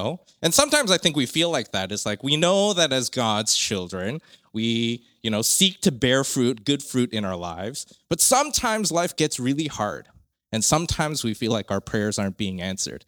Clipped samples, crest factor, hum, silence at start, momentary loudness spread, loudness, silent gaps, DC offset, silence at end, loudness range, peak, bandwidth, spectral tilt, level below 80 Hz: under 0.1%; 22 dB; none; 0 s; 12 LU; -22 LUFS; none; under 0.1%; 0.1 s; 4 LU; 0 dBFS; over 20 kHz; -3 dB/octave; -50 dBFS